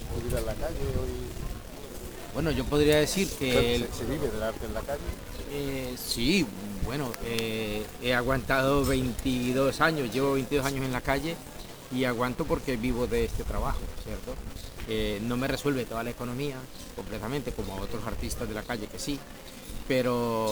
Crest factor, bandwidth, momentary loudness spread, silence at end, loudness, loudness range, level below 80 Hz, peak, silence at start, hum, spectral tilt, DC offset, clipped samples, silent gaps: 20 dB; over 20 kHz; 14 LU; 0 s; -30 LUFS; 6 LU; -40 dBFS; -8 dBFS; 0 s; none; -5 dB/octave; 0.2%; under 0.1%; none